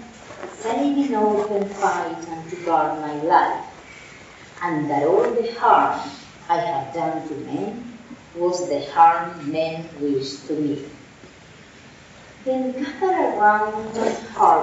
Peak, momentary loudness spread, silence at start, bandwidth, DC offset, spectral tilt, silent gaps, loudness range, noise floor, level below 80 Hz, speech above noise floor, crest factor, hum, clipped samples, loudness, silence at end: 0 dBFS; 20 LU; 0 s; 8 kHz; under 0.1%; -4 dB/octave; none; 6 LU; -45 dBFS; -60 dBFS; 25 dB; 22 dB; none; under 0.1%; -22 LUFS; 0 s